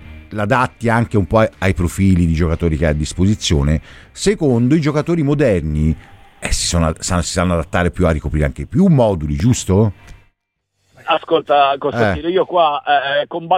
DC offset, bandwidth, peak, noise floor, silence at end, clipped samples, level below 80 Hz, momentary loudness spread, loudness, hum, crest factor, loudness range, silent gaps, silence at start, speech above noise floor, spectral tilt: under 0.1%; 15.5 kHz; -2 dBFS; -71 dBFS; 0 s; under 0.1%; -28 dBFS; 6 LU; -16 LUFS; none; 14 dB; 1 LU; none; 0 s; 56 dB; -5.5 dB/octave